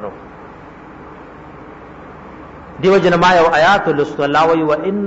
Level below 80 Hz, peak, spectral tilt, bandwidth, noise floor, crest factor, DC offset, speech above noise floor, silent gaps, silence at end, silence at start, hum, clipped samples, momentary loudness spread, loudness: -44 dBFS; -2 dBFS; -5.5 dB/octave; 8 kHz; -36 dBFS; 14 dB; under 0.1%; 23 dB; none; 0 s; 0 s; none; under 0.1%; 25 LU; -13 LUFS